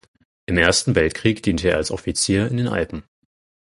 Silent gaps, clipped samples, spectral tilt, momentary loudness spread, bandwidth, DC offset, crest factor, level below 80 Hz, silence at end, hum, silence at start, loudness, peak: none; under 0.1%; -4.5 dB/octave; 10 LU; 11.5 kHz; under 0.1%; 20 dB; -38 dBFS; 0.65 s; none; 0.5 s; -20 LUFS; 0 dBFS